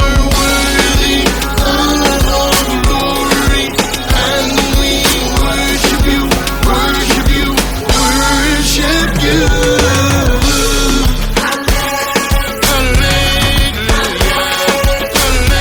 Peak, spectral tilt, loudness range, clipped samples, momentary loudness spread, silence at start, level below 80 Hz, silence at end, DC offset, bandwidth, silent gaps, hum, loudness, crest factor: 0 dBFS; -3.5 dB/octave; 1 LU; under 0.1%; 3 LU; 0 s; -16 dBFS; 0 s; under 0.1%; 19.5 kHz; none; none; -11 LUFS; 12 dB